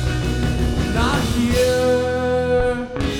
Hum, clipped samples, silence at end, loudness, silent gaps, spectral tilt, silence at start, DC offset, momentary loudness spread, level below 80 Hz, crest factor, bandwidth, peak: none; under 0.1%; 0 s; -19 LUFS; none; -5.5 dB/octave; 0 s; under 0.1%; 4 LU; -26 dBFS; 14 dB; 18 kHz; -4 dBFS